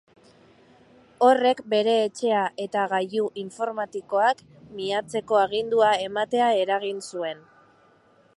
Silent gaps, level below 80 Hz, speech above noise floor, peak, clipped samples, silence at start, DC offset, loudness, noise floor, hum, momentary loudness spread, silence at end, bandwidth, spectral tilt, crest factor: none; -70 dBFS; 35 dB; -4 dBFS; under 0.1%; 1.2 s; under 0.1%; -24 LUFS; -59 dBFS; none; 11 LU; 1 s; 11.5 kHz; -4 dB/octave; 20 dB